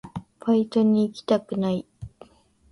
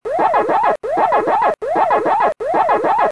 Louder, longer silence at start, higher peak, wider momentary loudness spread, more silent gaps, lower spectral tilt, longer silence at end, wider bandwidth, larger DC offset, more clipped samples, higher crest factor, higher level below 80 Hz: second, -24 LUFS vs -16 LUFS; about the same, 0.05 s vs 0.05 s; second, -8 dBFS vs -4 dBFS; first, 22 LU vs 3 LU; neither; first, -8 dB/octave vs -5.5 dB/octave; first, 0.65 s vs 0 s; about the same, 11 kHz vs 11 kHz; second, under 0.1% vs 0.4%; neither; first, 16 dB vs 10 dB; about the same, -56 dBFS vs -56 dBFS